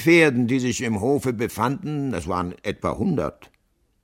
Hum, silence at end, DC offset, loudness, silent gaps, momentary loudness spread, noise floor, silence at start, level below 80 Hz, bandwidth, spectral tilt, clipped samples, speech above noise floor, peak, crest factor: none; 0.6 s; under 0.1%; -23 LUFS; none; 10 LU; -66 dBFS; 0 s; -48 dBFS; 16.5 kHz; -5.5 dB/octave; under 0.1%; 44 dB; -4 dBFS; 18 dB